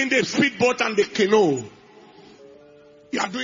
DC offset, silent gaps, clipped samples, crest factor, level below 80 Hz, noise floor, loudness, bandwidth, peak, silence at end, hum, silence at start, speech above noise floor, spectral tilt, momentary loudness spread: under 0.1%; none; under 0.1%; 16 dB; -66 dBFS; -49 dBFS; -21 LUFS; 7.6 kHz; -6 dBFS; 0 s; none; 0 s; 29 dB; -4 dB/octave; 11 LU